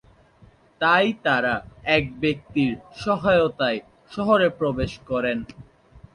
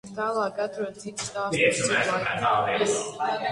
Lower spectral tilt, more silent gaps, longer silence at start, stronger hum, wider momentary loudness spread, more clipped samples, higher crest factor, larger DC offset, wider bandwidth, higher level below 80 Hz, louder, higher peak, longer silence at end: first, -6.5 dB/octave vs -3 dB/octave; neither; first, 0.8 s vs 0.05 s; neither; about the same, 10 LU vs 10 LU; neither; about the same, 18 dB vs 18 dB; neither; about the same, 11 kHz vs 11.5 kHz; first, -48 dBFS vs -62 dBFS; first, -22 LUFS vs -25 LUFS; first, -4 dBFS vs -8 dBFS; first, 0.15 s vs 0 s